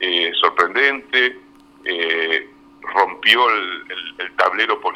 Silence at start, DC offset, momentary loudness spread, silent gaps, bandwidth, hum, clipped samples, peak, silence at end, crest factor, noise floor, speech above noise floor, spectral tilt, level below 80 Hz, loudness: 0 s; under 0.1%; 13 LU; none; 16.5 kHz; none; under 0.1%; 0 dBFS; 0 s; 20 dB; -46 dBFS; 27 dB; -2 dB/octave; -64 dBFS; -17 LUFS